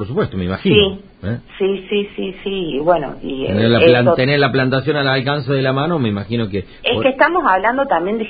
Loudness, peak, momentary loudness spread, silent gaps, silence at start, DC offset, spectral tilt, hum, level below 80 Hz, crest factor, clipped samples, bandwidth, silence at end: -16 LUFS; 0 dBFS; 11 LU; none; 0 s; under 0.1%; -10.5 dB/octave; none; -40 dBFS; 16 dB; under 0.1%; 5 kHz; 0 s